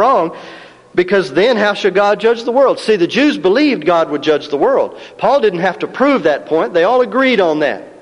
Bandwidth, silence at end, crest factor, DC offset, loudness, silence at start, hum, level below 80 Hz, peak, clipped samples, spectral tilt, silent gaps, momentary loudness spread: 11 kHz; 0.1 s; 12 dB; under 0.1%; -13 LUFS; 0 s; none; -56 dBFS; 0 dBFS; under 0.1%; -5.5 dB/octave; none; 6 LU